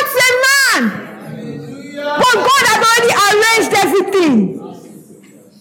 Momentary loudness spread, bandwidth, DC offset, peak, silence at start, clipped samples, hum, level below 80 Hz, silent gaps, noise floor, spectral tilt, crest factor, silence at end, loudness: 19 LU; 17.5 kHz; under 0.1%; -2 dBFS; 0 s; under 0.1%; none; -62 dBFS; none; -41 dBFS; -2.5 dB/octave; 12 dB; 0.6 s; -11 LUFS